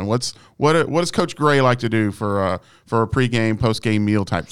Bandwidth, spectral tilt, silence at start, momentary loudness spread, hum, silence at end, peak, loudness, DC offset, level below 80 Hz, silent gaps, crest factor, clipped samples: 14.5 kHz; -6 dB/octave; 0 s; 6 LU; none; 0 s; -4 dBFS; -19 LUFS; 0.9%; -46 dBFS; none; 16 dB; under 0.1%